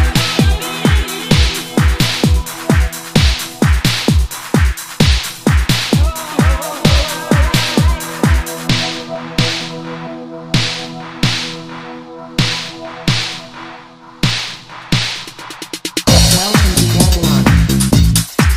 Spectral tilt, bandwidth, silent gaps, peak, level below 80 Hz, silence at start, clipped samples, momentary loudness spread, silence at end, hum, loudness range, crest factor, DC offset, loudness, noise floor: -4.5 dB/octave; 16.5 kHz; none; 0 dBFS; -20 dBFS; 0 s; under 0.1%; 14 LU; 0 s; none; 7 LU; 14 dB; under 0.1%; -14 LUFS; -36 dBFS